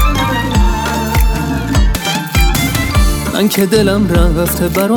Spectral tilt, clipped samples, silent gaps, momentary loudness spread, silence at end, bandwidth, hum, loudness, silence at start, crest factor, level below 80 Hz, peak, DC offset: -5 dB/octave; under 0.1%; none; 4 LU; 0 s; 19.5 kHz; none; -13 LUFS; 0 s; 12 dB; -16 dBFS; 0 dBFS; under 0.1%